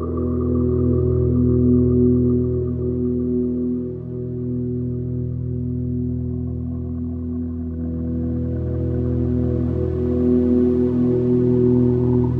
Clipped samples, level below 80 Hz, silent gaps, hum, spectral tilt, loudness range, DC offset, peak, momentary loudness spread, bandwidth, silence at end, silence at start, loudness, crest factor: under 0.1%; -32 dBFS; none; none; -13 dB/octave; 7 LU; under 0.1%; -6 dBFS; 10 LU; 2.6 kHz; 0 s; 0 s; -21 LUFS; 14 dB